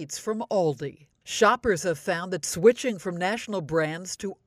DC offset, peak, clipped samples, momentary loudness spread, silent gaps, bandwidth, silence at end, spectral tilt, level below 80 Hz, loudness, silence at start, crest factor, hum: under 0.1%; -6 dBFS; under 0.1%; 12 LU; none; 15.5 kHz; 0.1 s; -4 dB/octave; -58 dBFS; -26 LUFS; 0 s; 20 dB; none